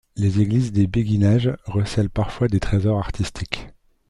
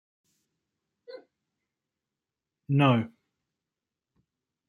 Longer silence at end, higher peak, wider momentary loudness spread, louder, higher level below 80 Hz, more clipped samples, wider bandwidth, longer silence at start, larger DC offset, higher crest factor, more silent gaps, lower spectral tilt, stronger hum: second, 0.4 s vs 1.6 s; first, -2 dBFS vs -8 dBFS; second, 9 LU vs 26 LU; first, -21 LUFS vs -25 LUFS; first, -36 dBFS vs -72 dBFS; neither; first, 11 kHz vs 4.7 kHz; second, 0.15 s vs 1.1 s; neither; second, 18 dB vs 24 dB; neither; about the same, -7.5 dB/octave vs -8.5 dB/octave; neither